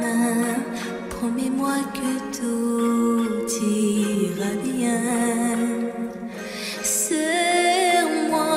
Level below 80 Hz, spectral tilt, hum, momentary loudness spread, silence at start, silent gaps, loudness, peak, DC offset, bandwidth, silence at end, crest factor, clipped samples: -56 dBFS; -3.5 dB/octave; none; 10 LU; 0 s; none; -23 LUFS; -8 dBFS; under 0.1%; 16 kHz; 0 s; 14 dB; under 0.1%